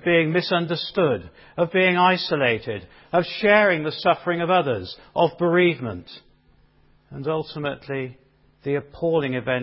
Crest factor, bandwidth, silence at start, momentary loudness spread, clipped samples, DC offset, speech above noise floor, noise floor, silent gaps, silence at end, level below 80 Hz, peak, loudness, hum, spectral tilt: 18 dB; 5.8 kHz; 0.05 s; 14 LU; under 0.1%; under 0.1%; 36 dB; -58 dBFS; none; 0 s; -56 dBFS; -4 dBFS; -22 LUFS; none; -10 dB/octave